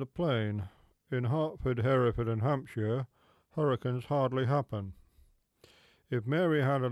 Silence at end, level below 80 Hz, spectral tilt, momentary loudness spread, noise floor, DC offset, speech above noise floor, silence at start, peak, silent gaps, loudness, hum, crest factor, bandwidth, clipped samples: 0 s; -56 dBFS; -8.5 dB/octave; 12 LU; -65 dBFS; under 0.1%; 35 dB; 0 s; -18 dBFS; none; -32 LUFS; none; 14 dB; 11.5 kHz; under 0.1%